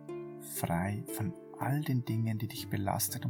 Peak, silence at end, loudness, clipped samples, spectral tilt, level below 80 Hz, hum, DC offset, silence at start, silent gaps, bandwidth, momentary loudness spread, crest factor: -18 dBFS; 0 s; -35 LUFS; under 0.1%; -5.5 dB/octave; -64 dBFS; none; under 0.1%; 0 s; none; 19 kHz; 8 LU; 18 dB